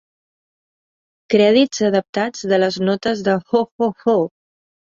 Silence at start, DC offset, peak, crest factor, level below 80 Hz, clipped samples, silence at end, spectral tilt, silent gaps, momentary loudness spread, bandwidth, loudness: 1.3 s; under 0.1%; -2 dBFS; 16 dB; -60 dBFS; under 0.1%; 0.6 s; -5 dB/octave; 2.09-2.13 s, 3.72-3.79 s; 8 LU; 7.6 kHz; -18 LUFS